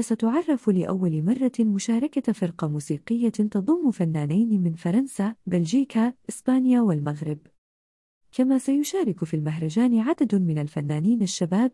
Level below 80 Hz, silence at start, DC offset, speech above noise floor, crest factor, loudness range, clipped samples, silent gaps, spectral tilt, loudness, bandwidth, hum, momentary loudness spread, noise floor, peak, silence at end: -68 dBFS; 0 s; under 0.1%; over 67 dB; 14 dB; 2 LU; under 0.1%; 7.58-8.21 s; -7 dB/octave; -24 LUFS; 12 kHz; none; 6 LU; under -90 dBFS; -10 dBFS; 0 s